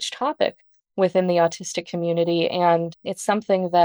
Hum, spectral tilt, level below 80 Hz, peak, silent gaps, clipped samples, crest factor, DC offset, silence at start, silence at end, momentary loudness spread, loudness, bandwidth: none; -5 dB/octave; -70 dBFS; -6 dBFS; none; under 0.1%; 16 dB; under 0.1%; 0 s; 0 s; 9 LU; -22 LUFS; over 20 kHz